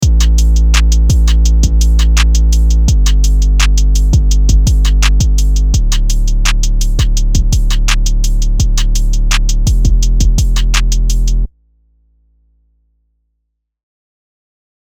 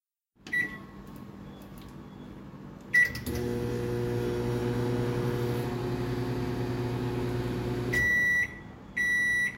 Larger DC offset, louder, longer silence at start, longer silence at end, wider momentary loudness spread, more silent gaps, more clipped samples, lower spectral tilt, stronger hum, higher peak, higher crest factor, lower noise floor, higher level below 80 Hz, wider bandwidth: neither; first, -13 LUFS vs -29 LUFS; second, 0 s vs 0.45 s; first, 3.45 s vs 0 s; second, 5 LU vs 22 LU; neither; neither; second, -4 dB/octave vs -6 dB/octave; neither; first, 0 dBFS vs -14 dBFS; second, 10 dB vs 16 dB; first, -70 dBFS vs -53 dBFS; first, -10 dBFS vs -48 dBFS; about the same, 15 kHz vs 16 kHz